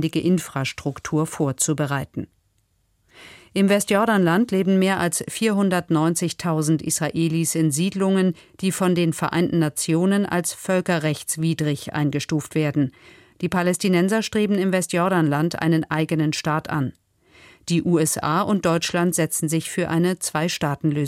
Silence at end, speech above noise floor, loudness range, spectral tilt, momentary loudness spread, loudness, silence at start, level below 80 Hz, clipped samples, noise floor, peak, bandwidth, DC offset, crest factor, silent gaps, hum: 0 s; 45 dB; 3 LU; -5 dB/octave; 6 LU; -21 LUFS; 0 s; -58 dBFS; under 0.1%; -66 dBFS; -8 dBFS; 16 kHz; under 0.1%; 14 dB; none; none